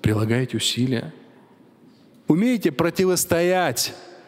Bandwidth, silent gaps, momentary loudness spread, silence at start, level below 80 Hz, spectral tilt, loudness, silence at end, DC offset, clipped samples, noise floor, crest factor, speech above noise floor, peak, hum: 16 kHz; none; 7 LU; 0.05 s; -54 dBFS; -4.5 dB/octave; -21 LUFS; 0.1 s; under 0.1%; under 0.1%; -52 dBFS; 18 dB; 31 dB; -4 dBFS; none